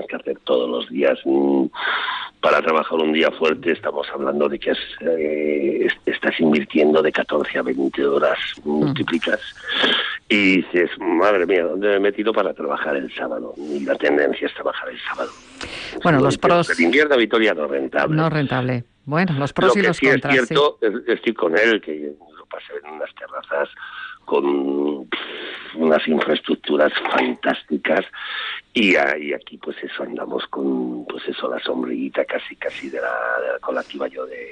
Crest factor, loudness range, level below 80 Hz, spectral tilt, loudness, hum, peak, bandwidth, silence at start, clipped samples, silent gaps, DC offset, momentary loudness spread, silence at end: 14 dB; 6 LU; -58 dBFS; -5.5 dB/octave; -20 LUFS; none; -6 dBFS; 10 kHz; 0 s; under 0.1%; none; under 0.1%; 12 LU; 0 s